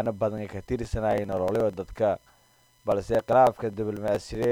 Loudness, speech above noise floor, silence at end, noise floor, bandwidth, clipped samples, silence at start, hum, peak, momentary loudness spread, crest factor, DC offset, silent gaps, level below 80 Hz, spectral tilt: -27 LUFS; 36 dB; 0 s; -62 dBFS; 16.5 kHz; under 0.1%; 0 s; none; -8 dBFS; 11 LU; 18 dB; under 0.1%; none; -46 dBFS; -7 dB/octave